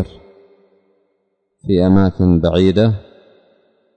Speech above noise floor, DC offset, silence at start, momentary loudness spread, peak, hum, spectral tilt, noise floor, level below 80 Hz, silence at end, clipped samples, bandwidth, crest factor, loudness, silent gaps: 55 dB; under 0.1%; 0 s; 14 LU; -4 dBFS; none; -9 dB/octave; -67 dBFS; -38 dBFS; 0.95 s; under 0.1%; 8.2 kHz; 14 dB; -14 LUFS; none